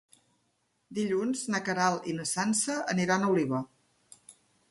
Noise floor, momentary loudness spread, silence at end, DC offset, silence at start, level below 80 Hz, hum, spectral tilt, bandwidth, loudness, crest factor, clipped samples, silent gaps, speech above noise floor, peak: -75 dBFS; 8 LU; 0.4 s; under 0.1%; 0.9 s; -72 dBFS; 60 Hz at -50 dBFS; -4 dB/octave; 11.5 kHz; -29 LUFS; 20 dB; under 0.1%; none; 46 dB; -12 dBFS